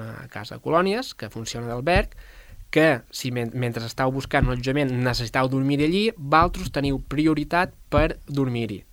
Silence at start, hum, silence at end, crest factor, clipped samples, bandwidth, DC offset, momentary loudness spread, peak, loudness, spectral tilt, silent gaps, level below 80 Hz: 0 s; none; 0.1 s; 22 dB; under 0.1%; 16.5 kHz; under 0.1%; 11 LU; -2 dBFS; -23 LUFS; -6 dB/octave; none; -36 dBFS